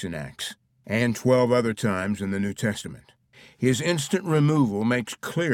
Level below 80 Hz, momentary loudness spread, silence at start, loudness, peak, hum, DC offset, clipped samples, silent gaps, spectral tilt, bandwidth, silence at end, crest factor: -58 dBFS; 13 LU; 0 s; -24 LUFS; -8 dBFS; none; under 0.1%; under 0.1%; none; -5.5 dB/octave; 17 kHz; 0 s; 18 dB